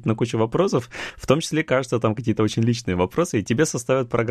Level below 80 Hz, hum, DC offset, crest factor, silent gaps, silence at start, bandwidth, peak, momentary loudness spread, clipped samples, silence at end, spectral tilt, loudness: -50 dBFS; none; under 0.1%; 18 dB; none; 0 s; 14 kHz; -2 dBFS; 2 LU; under 0.1%; 0 s; -5.5 dB/octave; -22 LUFS